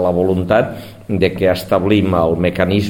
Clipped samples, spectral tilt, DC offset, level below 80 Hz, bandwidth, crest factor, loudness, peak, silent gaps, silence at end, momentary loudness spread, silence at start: under 0.1%; -7.5 dB/octave; 0.3%; -40 dBFS; 17 kHz; 14 dB; -16 LUFS; 0 dBFS; none; 0 s; 7 LU; 0 s